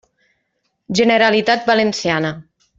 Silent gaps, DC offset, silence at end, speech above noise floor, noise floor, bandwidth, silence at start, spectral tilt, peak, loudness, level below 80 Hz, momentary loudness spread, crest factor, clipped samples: none; under 0.1%; 0.35 s; 55 dB; -70 dBFS; 7.8 kHz; 0.9 s; -4.5 dB/octave; -2 dBFS; -16 LUFS; -56 dBFS; 10 LU; 16 dB; under 0.1%